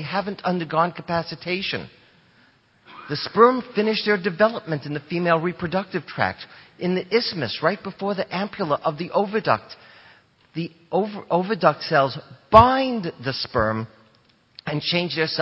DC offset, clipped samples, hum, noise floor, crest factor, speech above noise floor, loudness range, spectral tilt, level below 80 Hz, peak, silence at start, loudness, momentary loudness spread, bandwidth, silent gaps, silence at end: under 0.1%; under 0.1%; none; -59 dBFS; 22 dB; 37 dB; 5 LU; -8 dB/octave; -48 dBFS; 0 dBFS; 0 s; -22 LUFS; 14 LU; 7.4 kHz; none; 0 s